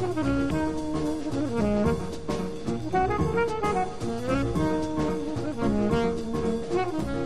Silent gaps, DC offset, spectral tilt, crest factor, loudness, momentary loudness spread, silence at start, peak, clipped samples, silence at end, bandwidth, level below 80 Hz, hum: none; 1%; -7 dB/octave; 16 dB; -27 LUFS; 6 LU; 0 s; -10 dBFS; under 0.1%; 0 s; 13.5 kHz; -40 dBFS; none